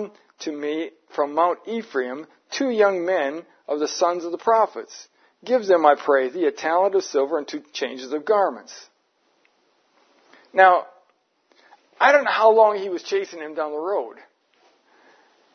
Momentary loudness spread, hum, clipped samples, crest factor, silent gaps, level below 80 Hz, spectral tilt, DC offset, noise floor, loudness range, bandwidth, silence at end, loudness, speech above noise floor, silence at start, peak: 16 LU; none; under 0.1%; 22 dB; none; -84 dBFS; -3 dB/octave; under 0.1%; -66 dBFS; 5 LU; 6.6 kHz; 1.4 s; -21 LUFS; 45 dB; 0 s; 0 dBFS